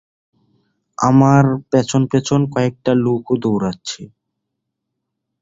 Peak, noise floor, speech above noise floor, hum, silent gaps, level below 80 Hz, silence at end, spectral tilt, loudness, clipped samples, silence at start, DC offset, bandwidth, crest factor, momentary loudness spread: -2 dBFS; -77 dBFS; 62 dB; none; none; -52 dBFS; 1.35 s; -7 dB/octave; -16 LUFS; under 0.1%; 1 s; under 0.1%; 7.8 kHz; 16 dB; 14 LU